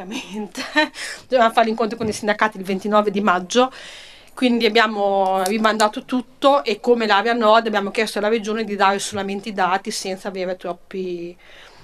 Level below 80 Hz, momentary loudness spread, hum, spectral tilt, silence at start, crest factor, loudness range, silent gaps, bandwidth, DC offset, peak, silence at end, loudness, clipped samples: -58 dBFS; 13 LU; none; -4 dB/octave; 0 s; 20 dB; 4 LU; none; 13.5 kHz; under 0.1%; 0 dBFS; 0.15 s; -19 LUFS; under 0.1%